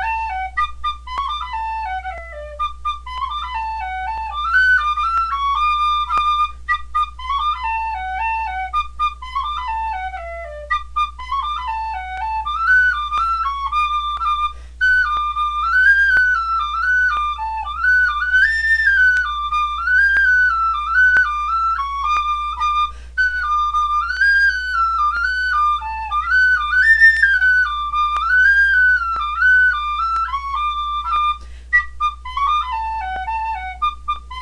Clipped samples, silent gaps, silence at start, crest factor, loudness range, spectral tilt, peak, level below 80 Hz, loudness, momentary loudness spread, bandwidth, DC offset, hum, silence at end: under 0.1%; none; 0 s; 16 dB; 9 LU; -1.5 dB/octave; -2 dBFS; -36 dBFS; -17 LUFS; 12 LU; 11 kHz; under 0.1%; 60 Hz at -35 dBFS; 0 s